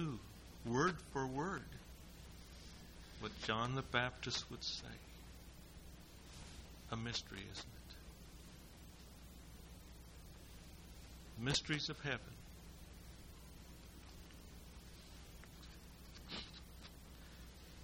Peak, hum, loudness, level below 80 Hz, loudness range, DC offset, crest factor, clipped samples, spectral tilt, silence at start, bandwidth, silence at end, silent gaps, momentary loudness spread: -20 dBFS; none; -43 LUFS; -60 dBFS; 14 LU; under 0.1%; 26 dB; under 0.1%; -4 dB/octave; 0 s; 16.5 kHz; 0 s; none; 19 LU